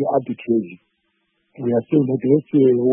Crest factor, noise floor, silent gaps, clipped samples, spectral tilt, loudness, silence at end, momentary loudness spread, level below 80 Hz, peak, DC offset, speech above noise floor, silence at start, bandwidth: 16 dB; -69 dBFS; none; under 0.1%; -13.5 dB/octave; -19 LUFS; 0 s; 8 LU; -66 dBFS; -2 dBFS; under 0.1%; 51 dB; 0 s; 3.6 kHz